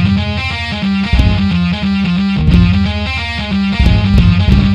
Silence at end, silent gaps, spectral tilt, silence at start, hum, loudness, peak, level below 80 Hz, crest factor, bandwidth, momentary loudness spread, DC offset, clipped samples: 0 s; none; -7 dB/octave; 0 s; none; -13 LUFS; 0 dBFS; -18 dBFS; 12 dB; 9 kHz; 7 LU; under 0.1%; 0.2%